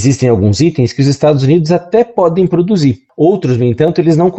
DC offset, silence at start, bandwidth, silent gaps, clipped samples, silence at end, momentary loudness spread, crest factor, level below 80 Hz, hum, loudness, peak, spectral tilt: under 0.1%; 0 s; 8.4 kHz; none; under 0.1%; 0 s; 2 LU; 10 dB; -42 dBFS; none; -11 LUFS; 0 dBFS; -7 dB/octave